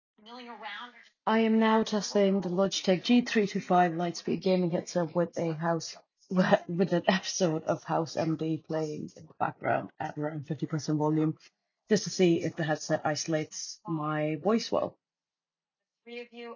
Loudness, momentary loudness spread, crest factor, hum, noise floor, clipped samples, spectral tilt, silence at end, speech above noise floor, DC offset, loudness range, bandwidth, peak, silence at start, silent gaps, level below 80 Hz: -29 LUFS; 15 LU; 22 dB; none; under -90 dBFS; under 0.1%; -5.5 dB/octave; 0 s; over 61 dB; under 0.1%; 6 LU; 7.4 kHz; -8 dBFS; 0.25 s; none; -74 dBFS